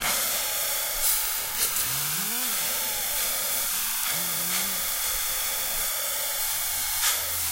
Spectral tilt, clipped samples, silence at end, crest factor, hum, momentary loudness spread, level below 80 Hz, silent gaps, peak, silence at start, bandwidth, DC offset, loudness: 0.5 dB/octave; under 0.1%; 0 s; 18 dB; none; 2 LU; -50 dBFS; none; -8 dBFS; 0 s; 16 kHz; under 0.1%; -24 LUFS